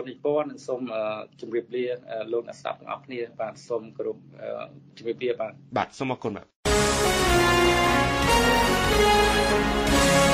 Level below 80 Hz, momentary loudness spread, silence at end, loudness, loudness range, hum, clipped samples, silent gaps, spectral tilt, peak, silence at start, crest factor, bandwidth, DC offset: -36 dBFS; 16 LU; 0 s; -24 LUFS; 13 LU; none; under 0.1%; 6.55-6.63 s; -4 dB/octave; -8 dBFS; 0 s; 16 dB; 15.5 kHz; under 0.1%